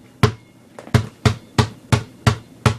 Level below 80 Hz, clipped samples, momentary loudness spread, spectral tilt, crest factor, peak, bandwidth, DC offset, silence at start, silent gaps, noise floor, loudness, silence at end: -38 dBFS; under 0.1%; 3 LU; -5.5 dB/octave; 20 dB; 0 dBFS; 14 kHz; under 0.1%; 0.25 s; none; -43 dBFS; -21 LUFS; 0 s